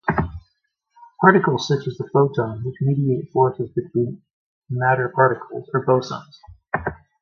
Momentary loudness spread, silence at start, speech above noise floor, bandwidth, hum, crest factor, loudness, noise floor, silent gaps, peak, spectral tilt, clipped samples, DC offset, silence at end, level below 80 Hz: 13 LU; 0.05 s; 51 dB; 7 kHz; none; 20 dB; -21 LUFS; -71 dBFS; 4.33-4.62 s; 0 dBFS; -7.5 dB/octave; under 0.1%; under 0.1%; 0.25 s; -46 dBFS